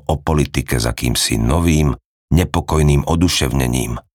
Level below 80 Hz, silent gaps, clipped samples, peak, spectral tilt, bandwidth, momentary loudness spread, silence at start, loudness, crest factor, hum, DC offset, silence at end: -26 dBFS; 2.05-2.28 s; under 0.1%; -2 dBFS; -5 dB/octave; 19 kHz; 4 LU; 0.1 s; -17 LUFS; 14 dB; none; under 0.1%; 0.15 s